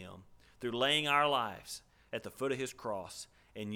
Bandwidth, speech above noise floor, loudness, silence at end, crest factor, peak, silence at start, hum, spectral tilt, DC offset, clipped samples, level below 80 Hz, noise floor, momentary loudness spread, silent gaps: 19.5 kHz; 21 dB; -34 LUFS; 0 s; 22 dB; -14 dBFS; 0 s; none; -3 dB/octave; under 0.1%; under 0.1%; -70 dBFS; -56 dBFS; 19 LU; none